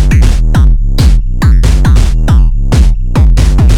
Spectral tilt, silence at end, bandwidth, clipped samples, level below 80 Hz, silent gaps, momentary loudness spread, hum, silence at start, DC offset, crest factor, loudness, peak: -6.5 dB/octave; 0 s; 11.5 kHz; under 0.1%; -6 dBFS; none; 2 LU; none; 0 s; under 0.1%; 6 dB; -9 LUFS; 0 dBFS